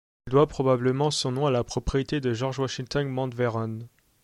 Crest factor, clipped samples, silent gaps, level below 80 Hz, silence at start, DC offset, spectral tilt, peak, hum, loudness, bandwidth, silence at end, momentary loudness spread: 18 dB; under 0.1%; none; -46 dBFS; 0.25 s; under 0.1%; -6 dB/octave; -8 dBFS; none; -26 LUFS; 12 kHz; 0.35 s; 7 LU